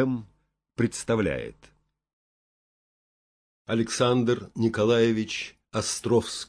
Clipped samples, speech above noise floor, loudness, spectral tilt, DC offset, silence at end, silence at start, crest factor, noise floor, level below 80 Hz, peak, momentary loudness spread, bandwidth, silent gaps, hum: under 0.1%; over 65 dB; -26 LUFS; -5 dB/octave; under 0.1%; 0.05 s; 0 s; 18 dB; under -90 dBFS; -56 dBFS; -10 dBFS; 11 LU; 11 kHz; 2.13-3.65 s; none